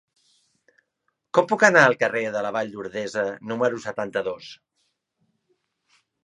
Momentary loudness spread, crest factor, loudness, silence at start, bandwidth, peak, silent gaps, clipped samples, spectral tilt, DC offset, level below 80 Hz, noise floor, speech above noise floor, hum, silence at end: 15 LU; 24 dB; -22 LUFS; 1.35 s; 11.5 kHz; 0 dBFS; none; under 0.1%; -4.5 dB/octave; under 0.1%; -72 dBFS; -76 dBFS; 54 dB; none; 1.7 s